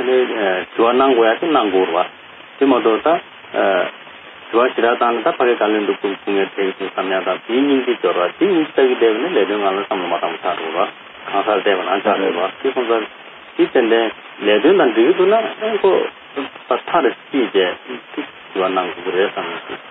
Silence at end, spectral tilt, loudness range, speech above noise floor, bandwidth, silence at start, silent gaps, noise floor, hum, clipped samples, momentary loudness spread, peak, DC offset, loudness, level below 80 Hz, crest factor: 0 s; -2 dB/octave; 3 LU; 21 dB; 4 kHz; 0 s; none; -37 dBFS; none; under 0.1%; 12 LU; -2 dBFS; under 0.1%; -17 LUFS; -66 dBFS; 14 dB